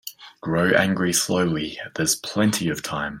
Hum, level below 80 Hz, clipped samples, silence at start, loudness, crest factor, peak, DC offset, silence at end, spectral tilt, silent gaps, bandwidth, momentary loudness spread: none; -54 dBFS; under 0.1%; 0.05 s; -22 LUFS; 20 dB; -4 dBFS; under 0.1%; 0 s; -4 dB/octave; none; 16.5 kHz; 9 LU